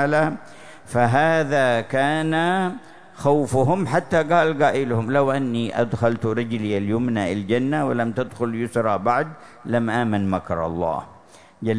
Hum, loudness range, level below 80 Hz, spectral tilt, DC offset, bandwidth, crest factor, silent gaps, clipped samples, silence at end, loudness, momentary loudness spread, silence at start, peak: none; 3 LU; -54 dBFS; -6.5 dB/octave; 0.7%; 11 kHz; 16 dB; none; under 0.1%; 0 s; -21 LUFS; 7 LU; 0 s; -6 dBFS